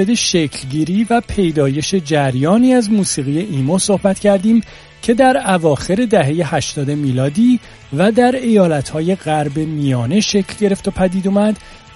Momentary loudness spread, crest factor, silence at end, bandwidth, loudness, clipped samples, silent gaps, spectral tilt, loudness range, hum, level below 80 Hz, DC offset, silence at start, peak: 6 LU; 14 dB; 0.2 s; 11.5 kHz; -15 LUFS; under 0.1%; none; -5.5 dB/octave; 1 LU; none; -42 dBFS; under 0.1%; 0 s; 0 dBFS